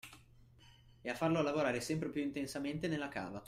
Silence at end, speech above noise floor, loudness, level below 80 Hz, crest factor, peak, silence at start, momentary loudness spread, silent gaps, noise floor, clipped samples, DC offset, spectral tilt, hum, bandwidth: 0 s; 25 dB; -38 LUFS; -66 dBFS; 18 dB; -20 dBFS; 0.05 s; 10 LU; none; -62 dBFS; under 0.1%; under 0.1%; -5.5 dB/octave; none; 15.5 kHz